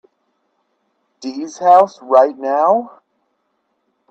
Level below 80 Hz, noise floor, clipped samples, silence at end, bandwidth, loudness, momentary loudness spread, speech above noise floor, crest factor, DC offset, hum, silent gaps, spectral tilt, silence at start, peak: -72 dBFS; -68 dBFS; under 0.1%; 1.2 s; 8 kHz; -14 LUFS; 18 LU; 54 dB; 18 dB; under 0.1%; none; none; -5 dB/octave; 1.2 s; 0 dBFS